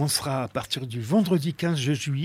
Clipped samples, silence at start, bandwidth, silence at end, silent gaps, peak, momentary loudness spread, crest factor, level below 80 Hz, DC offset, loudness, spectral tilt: under 0.1%; 0 s; 16 kHz; 0 s; none; -8 dBFS; 7 LU; 16 dB; -60 dBFS; under 0.1%; -26 LUFS; -5 dB/octave